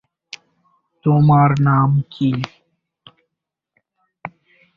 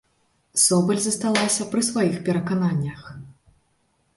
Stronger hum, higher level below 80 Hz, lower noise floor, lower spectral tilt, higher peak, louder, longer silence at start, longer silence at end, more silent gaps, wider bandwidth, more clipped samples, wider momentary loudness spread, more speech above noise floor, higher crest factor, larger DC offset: neither; first, -52 dBFS vs -60 dBFS; first, -81 dBFS vs -67 dBFS; first, -9 dB/octave vs -4 dB/octave; about the same, -2 dBFS vs -4 dBFS; first, -16 LUFS vs -21 LUFS; first, 1.05 s vs 0.55 s; second, 0.5 s vs 0.85 s; neither; second, 6.8 kHz vs 12 kHz; neither; first, 25 LU vs 15 LU; first, 67 dB vs 45 dB; about the same, 18 dB vs 20 dB; neither